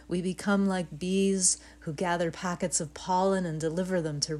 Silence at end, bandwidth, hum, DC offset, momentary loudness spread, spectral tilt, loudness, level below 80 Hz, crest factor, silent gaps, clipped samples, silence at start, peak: 0 s; 12.5 kHz; none; under 0.1%; 8 LU; -4 dB/octave; -29 LUFS; -56 dBFS; 18 dB; none; under 0.1%; 0 s; -12 dBFS